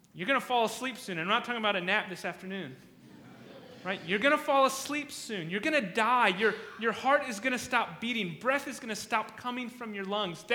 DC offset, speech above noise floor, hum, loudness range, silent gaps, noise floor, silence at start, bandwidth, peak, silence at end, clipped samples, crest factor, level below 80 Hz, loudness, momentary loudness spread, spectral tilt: under 0.1%; 22 dB; none; 4 LU; none; -52 dBFS; 0.15 s; 19.5 kHz; -10 dBFS; 0 s; under 0.1%; 20 dB; -74 dBFS; -30 LUFS; 12 LU; -3.5 dB/octave